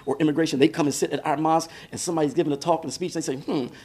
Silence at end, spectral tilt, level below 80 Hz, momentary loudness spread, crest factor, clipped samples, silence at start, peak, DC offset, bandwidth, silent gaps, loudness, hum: 0 s; -5 dB/octave; -64 dBFS; 8 LU; 20 dB; under 0.1%; 0 s; -4 dBFS; under 0.1%; 15 kHz; none; -24 LUFS; none